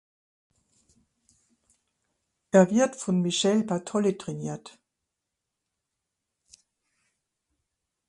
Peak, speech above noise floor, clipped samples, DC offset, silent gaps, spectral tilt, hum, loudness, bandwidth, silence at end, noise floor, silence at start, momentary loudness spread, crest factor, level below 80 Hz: -6 dBFS; 60 dB; under 0.1%; under 0.1%; none; -5 dB/octave; none; -25 LUFS; 11 kHz; 3.4 s; -85 dBFS; 2.55 s; 14 LU; 24 dB; -72 dBFS